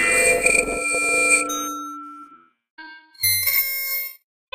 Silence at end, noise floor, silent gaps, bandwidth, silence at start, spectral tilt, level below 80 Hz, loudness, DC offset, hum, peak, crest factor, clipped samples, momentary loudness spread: 0.4 s; -48 dBFS; 2.70-2.77 s; 16 kHz; 0 s; -0.5 dB/octave; -50 dBFS; -18 LUFS; under 0.1%; none; -2 dBFS; 20 dB; under 0.1%; 16 LU